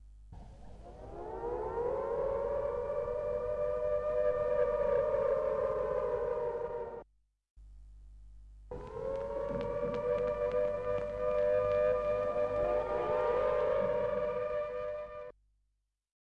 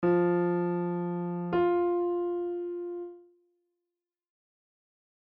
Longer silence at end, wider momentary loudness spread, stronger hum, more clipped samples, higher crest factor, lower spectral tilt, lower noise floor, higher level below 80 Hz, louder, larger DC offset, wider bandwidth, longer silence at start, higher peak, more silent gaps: second, 0.9 s vs 2.2 s; first, 15 LU vs 11 LU; first, 50 Hz at -55 dBFS vs none; neither; about the same, 12 dB vs 16 dB; about the same, -7.5 dB/octave vs -8.5 dB/octave; second, -81 dBFS vs -89 dBFS; first, -52 dBFS vs -70 dBFS; second, -34 LUFS vs -30 LUFS; neither; first, 6.6 kHz vs 4 kHz; about the same, 0 s vs 0 s; second, -22 dBFS vs -16 dBFS; first, 7.50-7.56 s vs none